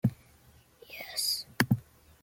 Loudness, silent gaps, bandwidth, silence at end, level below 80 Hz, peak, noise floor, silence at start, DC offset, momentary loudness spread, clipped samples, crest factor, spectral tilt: -31 LUFS; none; 17 kHz; 0.4 s; -62 dBFS; -6 dBFS; -60 dBFS; 0.05 s; under 0.1%; 13 LU; under 0.1%; 28 dB; -4 dB/octave